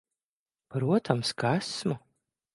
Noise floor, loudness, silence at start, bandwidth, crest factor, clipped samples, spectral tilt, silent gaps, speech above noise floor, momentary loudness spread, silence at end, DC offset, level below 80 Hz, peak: under -90 dBFS; -29 LUFS; 0.7 s; 11.5 kHz; 24 dB; under 0.1%; -5.5 dB/octave; none; over 62 dB; 9 LU; 0.55 s; under 0.1%; -70 dBFS; -8 dBFS